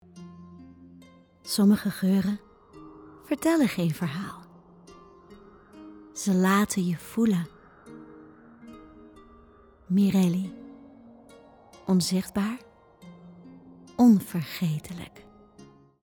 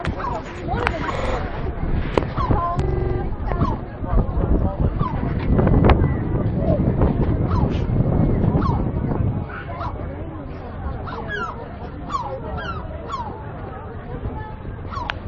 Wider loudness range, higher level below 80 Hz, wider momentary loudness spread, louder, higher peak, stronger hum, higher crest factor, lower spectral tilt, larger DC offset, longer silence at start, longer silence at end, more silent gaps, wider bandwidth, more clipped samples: second, 4 LU vs 10 LU; second, -62 dBFS vs -28 dBFS; first, 26 LU vs 13 LU; about the same, -25 LUFS vs -23 LUFS; second, -10 dBFS vs 0 dBFS; neither; about the same, 20 dB vs 22 dB; second, -6 dB/octave vs -9 dB/octave; second, under 0.1% vs 0.2%; first, 0.15 s vs 0 s; first, 0.95 s vs 0 s; neither; first, 19.5 kHz vs 8.2 kHz; neither